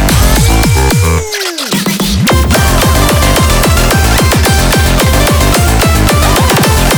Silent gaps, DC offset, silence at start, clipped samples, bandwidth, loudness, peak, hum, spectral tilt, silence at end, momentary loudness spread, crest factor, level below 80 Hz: none; under 0.1%; 0 s; under 0.1%; over 20 kHz; -9 LUFS; 0 dBFS; none; -4 dB/octave; 0 s; 4 LU; 8 dB; -12 dBFS